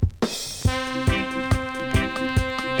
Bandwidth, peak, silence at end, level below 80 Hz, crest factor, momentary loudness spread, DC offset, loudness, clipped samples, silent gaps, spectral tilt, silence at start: over 20 kHz; -6 dBFS; 0 s; -32 dBFS; 18 dB; 2 LU; under 0.1%; -24 LUFS; under 0.1%; none; -5 dB/octave; 0 s